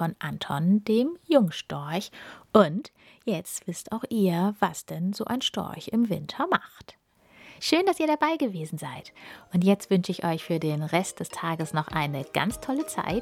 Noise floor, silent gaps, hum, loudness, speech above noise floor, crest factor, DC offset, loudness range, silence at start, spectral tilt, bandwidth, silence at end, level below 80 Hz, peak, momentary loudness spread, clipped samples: -55 dBFS; none; none; -27 LUFS; 28 dB; 22 dB; under 0.1%; 3 LU; 0 s; -5.5 dB/octave; 16.5 kHz; 0 s; -58 dBFS; -4 dBFS; 11 LU; under 0.1%